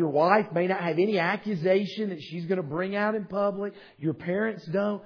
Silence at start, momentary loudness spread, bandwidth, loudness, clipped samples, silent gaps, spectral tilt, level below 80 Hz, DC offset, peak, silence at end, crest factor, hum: 0 s; 10 LU; 5.4 kHz; -27 LUFS; under 0.1%; none; -8 dB/octave; -72 dBFS; under 0.1%; -6 dBFS; 0 s; 20 dB; none